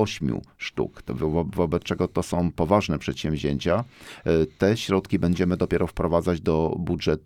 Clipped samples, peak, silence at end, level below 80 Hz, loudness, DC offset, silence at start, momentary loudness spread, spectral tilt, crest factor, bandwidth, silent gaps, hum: under 0.1%; -6 dBFS; 0.05 s; -42 dBFS; -25 LUFS; under 0.1%; 0 s; 7 LU; -6.5 dB/octave; 18 dB; 14.5 kHz; none; none